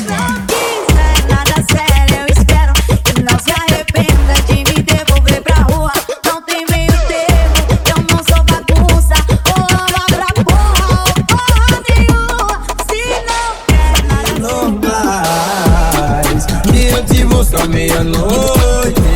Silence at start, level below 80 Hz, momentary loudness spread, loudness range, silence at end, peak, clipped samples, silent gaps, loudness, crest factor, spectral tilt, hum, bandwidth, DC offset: 0 s; -14 dBFS; 5 LU; 2 LU; 0 s; 0 dBFS; under 0.1%; none; -11 LUFS; 10 dB; -4.5 dB/octave; none; 19 kHz; under 0.1%